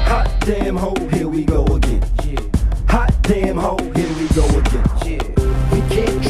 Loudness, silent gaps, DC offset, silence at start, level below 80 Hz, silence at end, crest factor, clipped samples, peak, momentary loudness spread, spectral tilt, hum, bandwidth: -18 LUFS; none; under 0.1%; 0 s; -18 dBFS; 0 s; 14 dB; under 0.1%; 0 dBFS; 4 LU; -6.5 dB/octave; none; 13 kHz